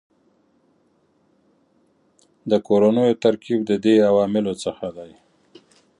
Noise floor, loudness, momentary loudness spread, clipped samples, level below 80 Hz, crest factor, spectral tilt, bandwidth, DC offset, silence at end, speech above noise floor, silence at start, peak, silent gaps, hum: -63 dBFS; -19 LUFS; 16 LU; under 0.1%; -62 dBFS; 18 dB; -6.5 dB/octave; 11 kHz; under 0.1%; 0.95 s; 44 dB; 2.45 s; -4 dBFS; none; none